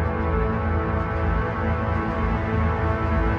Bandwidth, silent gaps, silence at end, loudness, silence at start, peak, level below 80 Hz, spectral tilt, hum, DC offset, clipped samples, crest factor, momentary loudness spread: 5.8 kHz; none; 0 s; -24 LUFS; 0 s; -10 dBFS; -28 dBFS; -9.5 dB/octave; none; under 0.1%; under 0.1%; 12 dB; 2 LU